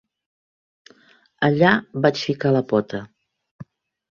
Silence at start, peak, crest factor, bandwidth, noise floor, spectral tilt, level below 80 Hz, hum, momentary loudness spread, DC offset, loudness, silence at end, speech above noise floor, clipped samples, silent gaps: 1.4 s; -2 dBFS; 22 dB; 7.2 kHz; -55 dBFS; -7 dB/octave; -60 dBFS; none; 8 LU; under 0.1%; -20 LUFS; 0.5 s; 36 dB; under 0.1%; 3.51-3.59 s